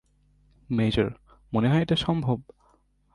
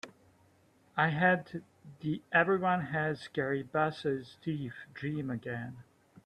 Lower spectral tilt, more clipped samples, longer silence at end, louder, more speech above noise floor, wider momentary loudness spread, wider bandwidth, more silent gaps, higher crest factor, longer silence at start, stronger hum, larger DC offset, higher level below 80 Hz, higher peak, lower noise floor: about the same, -7.5 dB/octave vs -7.5 dB/octave; neither; first, 0.7 s vs 0.45 s; first, -26 LUFS vs -32 LUFS; first, 40 dB vs 33 dB; second, 8 LU vs 14 LU; about the same, 11 kHz vs 11 kHz; neither; about the same, 18 dB vs 20 dB; first, 0.7 s vs 0.05 s; first, 50 Hz at -45 dBFS vs none; neither; first, -48 dBFS vs -70 dBFS; first, -10 dBFS vs -14 dBFS; about the same, -64 dBFS vs -66 dBFS